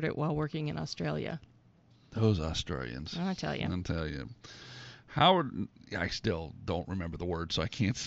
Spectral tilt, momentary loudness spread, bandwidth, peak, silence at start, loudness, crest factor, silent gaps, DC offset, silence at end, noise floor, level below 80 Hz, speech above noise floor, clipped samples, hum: -4.5 dB/octave; 15 LU; 8 kHz; -12 dBFS; 0 s; -33 LUFS; 22 dB; none; under 0.1%; 0 s; -62 dBFS; -50 dBFS; 30 dB; under 0.1%; none